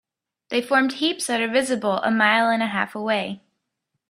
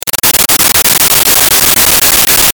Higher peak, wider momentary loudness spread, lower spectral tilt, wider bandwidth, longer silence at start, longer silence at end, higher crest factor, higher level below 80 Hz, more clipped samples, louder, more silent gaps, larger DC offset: second, -4 dBFS vs 0 dBFS; first, 9 LU vs 1 LU; first, -3.5 dB/octave vs 0 dB/octave; second, 15 kHz vs over 20 kHz; first, 0.5 s vs 0.05 s; first, 0.75 s vs 0.05 s; first, 20 dB vs 8 dB; second, -70 dBFS vs -32 dBFS; second, under 0.1% vs 2%; second, -21 LUFS vs -4 LUFS; neither; neither